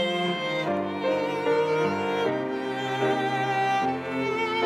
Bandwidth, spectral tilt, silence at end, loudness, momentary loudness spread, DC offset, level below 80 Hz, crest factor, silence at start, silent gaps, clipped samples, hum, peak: 15 kHz; -5.5 dB/octave; 0 s; -26 LUFS; 4 LU; under 0.1%; -72 dBFS; 14 dB; 0 s; none; under 0.1%; none; -12 dBFS